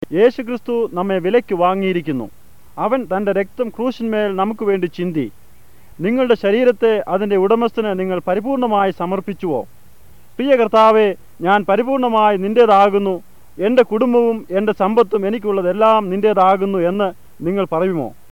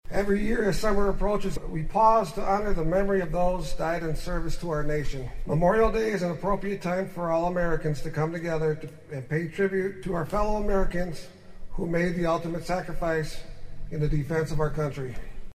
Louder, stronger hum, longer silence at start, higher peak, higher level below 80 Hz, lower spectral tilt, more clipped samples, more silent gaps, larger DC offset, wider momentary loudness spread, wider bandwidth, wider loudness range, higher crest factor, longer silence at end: first, -16 LUFS vs -28 LUFS; neither; about the same, 0.1 s vs 0.05 s; first, -2 dBFS vs -8 dBFS; second, -54 dBFS vs -34 dBFS; about the same, -7.5 dB/octave vs -7 dB/octave; neither; neither; first, 1% vs under 0.1%; about the same, 10 LU vs 12 LU; first, 17 kHz vs 13.5 kHz; about the same, 6 LU vs 4 LU; about the same, 14 dB vs 18 dB; first, 0.2 s vs 0 s